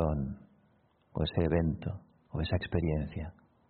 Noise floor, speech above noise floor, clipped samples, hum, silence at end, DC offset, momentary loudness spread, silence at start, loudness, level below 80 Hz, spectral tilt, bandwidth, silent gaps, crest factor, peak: -68 dBFS; 37 dB; under 0.1%; none; 0.35 s; under 0.1%; 14 LU; 0 s; -34 LUFS; -44 dBFS; -6.5 dB/octave; 4.5 kHz; none; 20 dB; -14 dBFS